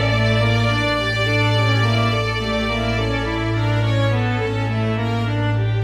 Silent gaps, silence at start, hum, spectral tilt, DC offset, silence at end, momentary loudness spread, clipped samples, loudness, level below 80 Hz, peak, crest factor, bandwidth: none; 0 s; none; -6 dB/octave; under 0.1%; 0 s; 4 LU; under 0.1%; -19 LUFS; -34 dBFS; -6 dBFS; 14 dB; 10 kHz